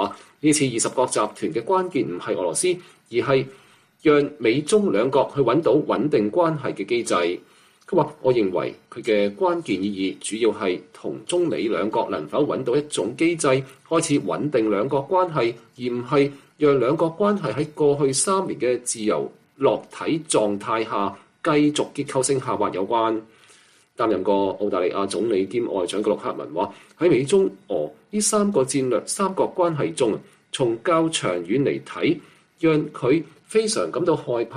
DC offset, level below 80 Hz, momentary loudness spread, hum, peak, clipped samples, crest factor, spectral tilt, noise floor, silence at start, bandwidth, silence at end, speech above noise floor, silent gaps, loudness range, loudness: under 0.1%; -64 dBFS; 7 LU; none; -6 dBFS; under 0.1%; 16 dB; -4.5 dB/octave; -54 dBFS; 0 s; 14 kHz; 0 s; 33 dB; none; 3 LU; -22 LUFS